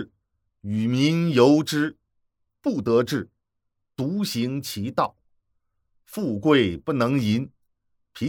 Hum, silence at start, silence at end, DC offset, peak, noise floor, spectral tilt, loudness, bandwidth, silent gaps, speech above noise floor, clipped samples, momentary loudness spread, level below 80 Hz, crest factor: none; 0 s; 0 s; under 0.1%; -4 dBFS; -77 dBFS; -6 dB/octave; -23 LUFS; 18.5 kHz; none; 55 dB; under 0.1%; 14 LU; -60 dBFS; 20 dB